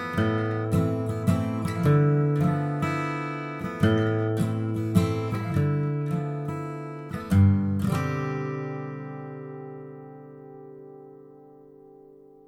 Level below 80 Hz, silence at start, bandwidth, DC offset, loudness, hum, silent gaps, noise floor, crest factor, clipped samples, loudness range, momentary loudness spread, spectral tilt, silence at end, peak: -54 dBFS; 0 s; 15 kHz; under 0.1%; -26 LUFS; none; none; -51 dBFS; 20 dB; under 0.1%; 13 LU; 21 LU; -8 dB/octave; 0.75 s; -6 dBFS